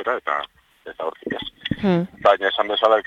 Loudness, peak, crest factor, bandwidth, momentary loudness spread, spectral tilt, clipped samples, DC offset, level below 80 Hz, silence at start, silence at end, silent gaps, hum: -22 LUFS; -2 dBFS; 18 dB; 7.6 kHz; 15 LU; -7 dB/octave; under 0.1%; under 0.1%; -52 dBFS; 0 s; 0.05 s; none; none